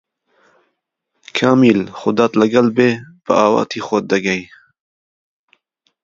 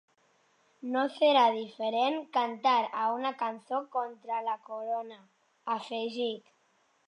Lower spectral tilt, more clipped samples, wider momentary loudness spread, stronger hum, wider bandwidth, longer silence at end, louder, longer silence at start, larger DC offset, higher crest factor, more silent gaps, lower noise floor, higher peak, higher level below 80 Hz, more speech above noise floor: first, -6 dB/octave vs -4 dB/octave; neither; second, 8 LU vs 11 LU; neither; second, 7.6 kHz vs 10.5 kHz; first, 1.6 s vs 0.7 s; first, -15 LUFS vs -30 LUFS; first, 1.35 s vs 0.85 s; neither; about the same, 18 dB vs 20 dB; neither; about the same, -72 dBFS vs -70 dBFS; first, 0 dBFS vs -12 dBFS; first, -60 dBFS vs under -90 dBFS; first, 58 dB vs 40 dB